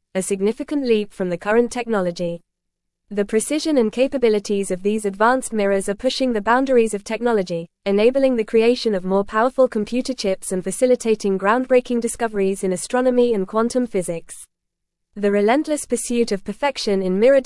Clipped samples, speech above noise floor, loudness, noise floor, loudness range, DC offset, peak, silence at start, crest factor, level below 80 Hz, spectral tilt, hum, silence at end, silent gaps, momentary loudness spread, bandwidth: under 0.1%; 59 dB; -20 LUFS; -78 dBFS; 3 LU; under 0.1%; -4 dBFS; 0.15 s; 16 dB; -50 dBFS; -4.5 dB/octave; none; 0 s; none; 7 LU; 12 kHz